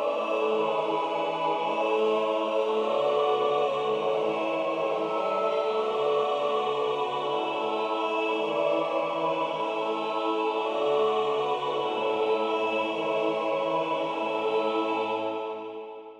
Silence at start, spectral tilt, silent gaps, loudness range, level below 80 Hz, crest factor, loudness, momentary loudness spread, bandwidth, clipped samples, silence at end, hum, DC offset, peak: 0 s; -5 dB/octave; none; 2 LU; -78 dBFS; 14 dB; -27 LUFS; 4 LU; 9.4 kHz; under 0.1%; 0 s; none; under 0.1%; -14 dBFS